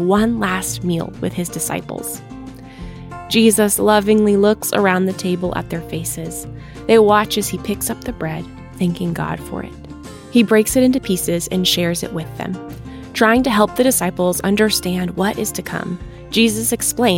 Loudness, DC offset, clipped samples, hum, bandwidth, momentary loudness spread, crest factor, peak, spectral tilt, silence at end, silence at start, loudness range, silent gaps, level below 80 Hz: -17 LUFS; under 0.1%; under 0.1%; none; 17 kHz; 17 LU; 16 dB; 0 dBFS; -4 dB/octave; 0 s; 0 s; 4 LU; none; -42 dBFS